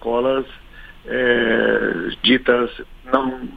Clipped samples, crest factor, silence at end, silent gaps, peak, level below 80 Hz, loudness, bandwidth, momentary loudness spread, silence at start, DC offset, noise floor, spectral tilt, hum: under 0.1%; 18 dB; 0 s; none; 0 dBFS; -42 dBFS; -18 LUFS; 5 kHz; 11 LU; 0 s; under 0.1%; -41 dBFS; -6.5 dB/octave; none